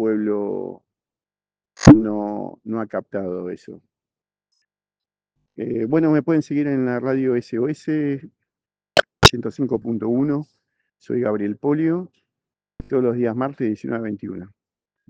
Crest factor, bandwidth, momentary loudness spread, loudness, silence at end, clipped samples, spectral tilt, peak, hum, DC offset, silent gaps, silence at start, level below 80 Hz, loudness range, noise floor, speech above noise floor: 22 dB; 10 kHz; 16 LU; -20 LUFS; 0.65 s; 0.1%; -5.5 dB/octave; 0 dBFS; none; under 0.1%; none; 0 s; -42 dBFS; 6 LU; under -90 dBFS; over 70 dB